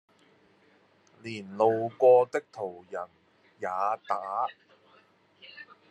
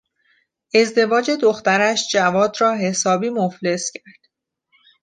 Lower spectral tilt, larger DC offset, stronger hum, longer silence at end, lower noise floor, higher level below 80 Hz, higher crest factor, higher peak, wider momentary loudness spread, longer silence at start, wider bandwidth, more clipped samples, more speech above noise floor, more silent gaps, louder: first, -6 dB/octave vs -3.5 dB/octave; neither; neither; second, 0.25 s vs 1.15 s; second, -63 dBFS vs -68 dBFS; second, -84 dBFS vs -66 dBFS; about the same, 20 dB vs 16 dB; second, -10 dBFS vs -2 dBFS; first, 25 LU vs 6 LU; first, 1.25 s vs 0.75 s; second, 8.6 kHz vs 9.8 kHz; neither; second, 36 dB vs 50 dB; neither; second, -28 LUFS vs -18 LUFS